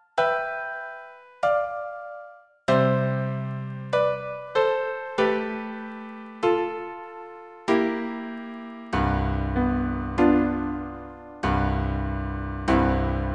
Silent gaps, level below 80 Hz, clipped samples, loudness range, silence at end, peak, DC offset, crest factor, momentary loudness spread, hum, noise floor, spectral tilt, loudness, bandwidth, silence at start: none; -36 dBFS; under 0.1%; 3 LU; 0 s; -8 dBFS; under 0.1%; 18 dB; 16 LU; none; -46 dBFS; -7.5 dB/octave; -26 LUFS; 9.8 kHz; 0.15 s